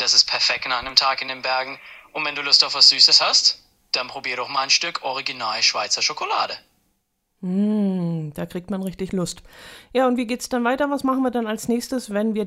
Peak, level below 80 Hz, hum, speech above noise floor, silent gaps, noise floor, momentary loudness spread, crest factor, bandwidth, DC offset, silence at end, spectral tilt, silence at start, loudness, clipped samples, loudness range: 0 dBFS; -56 dBFS; none; 50 dB; none; -71 dBFS; 16 LU; 22 dB; 16 kHz; under 0.1%; 0 s; -2.5 dB/octave; 0 s; -19 LUFS; under 0.1%; 9 LU